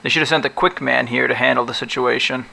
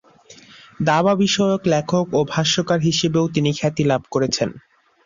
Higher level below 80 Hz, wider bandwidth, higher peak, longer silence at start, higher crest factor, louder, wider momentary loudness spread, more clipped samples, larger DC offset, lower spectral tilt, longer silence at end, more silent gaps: about the same, -52 dBFS vs -54 dBFS; first, 11 kHz vs 7.6 kHz; about the same, -2 dBFS vs -4 dBFS; second, 0.05 s vs 0.3 s; about the same, 16 dB vs 16 dB; about the same, -17 LUFS vs -19 LUFS; about the same, 4 LU vs 4 LU; neither; neither; about the same, -4 dB/octave vs -5 dB/octave; second, 0 s vs 0.45 s; neither